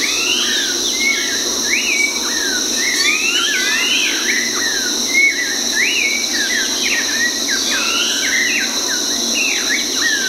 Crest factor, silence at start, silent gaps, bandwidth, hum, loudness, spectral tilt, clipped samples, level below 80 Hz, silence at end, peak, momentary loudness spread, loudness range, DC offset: 14 dB; 0 s; none; 16 kHz; none; -14 LUFS; 1.5 dB/octave; under 0.1%; -50 dBFS; 0 s; -2 dBFS; 3 LU; 1 LU; under 0.1%